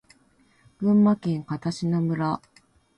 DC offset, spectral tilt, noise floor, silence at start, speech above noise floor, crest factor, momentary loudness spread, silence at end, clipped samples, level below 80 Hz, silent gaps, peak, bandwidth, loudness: under 0.1%; -8 dB/octave; -61 dBFS; 0.8 s; 38 dB; 14 dB; 9 LU; 0.6 s; under 0.1%; -62 dBFS; none; -12 dBFS; 10 kHz; -24 LUFS